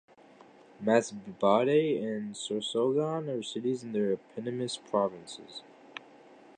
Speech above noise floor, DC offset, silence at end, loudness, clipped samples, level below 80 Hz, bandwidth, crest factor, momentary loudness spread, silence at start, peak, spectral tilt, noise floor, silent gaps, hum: 26 dB; under 0.1%; 0.25 s; -30 LUFS; under 0.1%; -78 dBFS; 10 kHz; 22 dB; 19 LU; 0.8 s; -10 dBFS; -5 dB/octave; -56 dBFS; none; none